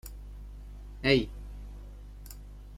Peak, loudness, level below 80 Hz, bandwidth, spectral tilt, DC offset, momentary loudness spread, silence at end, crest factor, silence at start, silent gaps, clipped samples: -10 dBFS; -28 LUFS; -44 dBFS; 16.5 kHz; -5.5 dB/octave; under 0.1%; 22 LU; 0 s; 24 dB; 0.05 s; none; under 0.1%